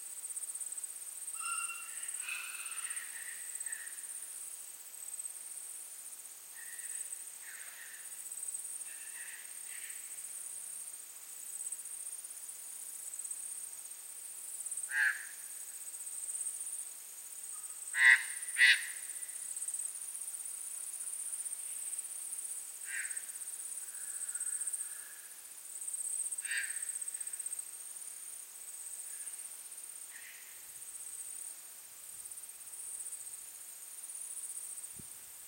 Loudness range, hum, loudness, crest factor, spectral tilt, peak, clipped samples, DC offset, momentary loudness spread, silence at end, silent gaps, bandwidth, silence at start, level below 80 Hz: 14 LU; none; -38 LUFS; 28 dB; 4 dB/octave; -12 dBFS; under 0.1%; under 0.1%; 10 LU; 0 s; none; 16.5 kHz; 0 s; under -90 dBFS